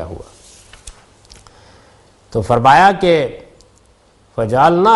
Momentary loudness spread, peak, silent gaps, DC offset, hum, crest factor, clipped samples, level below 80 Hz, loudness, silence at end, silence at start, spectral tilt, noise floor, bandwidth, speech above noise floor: 20 LU; 0 dBFS; none; under 0.1%; none; 16 dB; under 0.1%; -44 dBFS; -13 LUFS; 0 s; 0 s; -6 dB/octave; -51 dBFS; 12 kHz; 39 dB